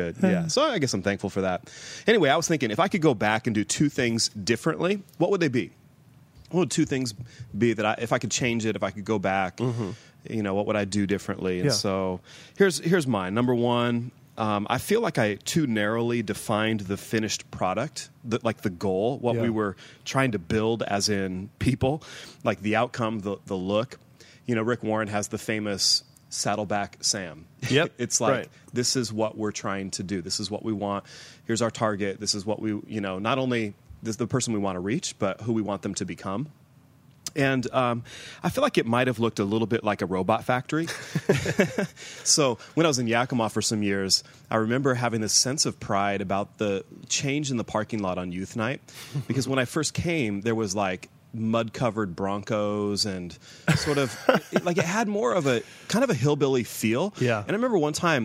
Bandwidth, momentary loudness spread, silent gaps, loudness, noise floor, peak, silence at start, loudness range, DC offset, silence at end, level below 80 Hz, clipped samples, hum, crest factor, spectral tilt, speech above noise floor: 16 kHz; 8 LU; none; -26 LUFS; -56 dBFS; -4 dBFS; 0 s; 4 LU; under 0.1%; 0 s; -58 dBFS; under 0.1%; none; 22 dB; -4.5 dB/octave; 30 dB